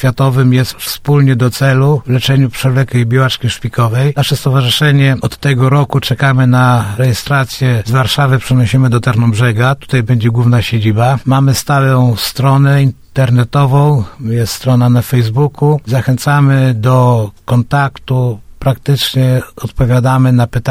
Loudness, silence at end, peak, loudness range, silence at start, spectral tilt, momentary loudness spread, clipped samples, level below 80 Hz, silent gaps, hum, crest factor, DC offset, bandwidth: -11 LUFS; 0 s; 0 dBFS; 1 LU; 0 s; -6.5 dB/octave; 5 LU; under 0.1%; -36 dBFS; none; none; 10 dB; under 0.1%; 15.5 kHz